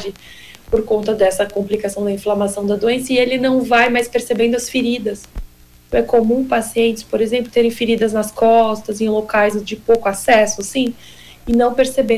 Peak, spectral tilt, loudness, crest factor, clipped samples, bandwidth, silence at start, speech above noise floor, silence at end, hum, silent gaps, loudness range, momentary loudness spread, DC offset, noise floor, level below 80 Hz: -2 dBFS; -4 dB/octave; -16 LUFS; 14 dB; under 0.1%; 16 kHz; 0 s; 22 dB; 0 s; none; none; 2 LU; 8 LU; under 0.1%; -38 dBFS; -40 dBFS